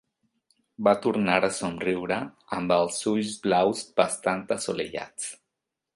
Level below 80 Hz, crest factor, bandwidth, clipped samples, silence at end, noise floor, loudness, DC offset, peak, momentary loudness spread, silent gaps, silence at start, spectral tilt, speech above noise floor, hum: -62 dBFS; 22 dB; 11.5 kHz; under 0.1%; 0.6 s; -85 dBFS; -26 LUFS; under 0.1%; -6 dBFS; 10 LU; none; 0.8 s; -4 dB/octave; 59 dB; none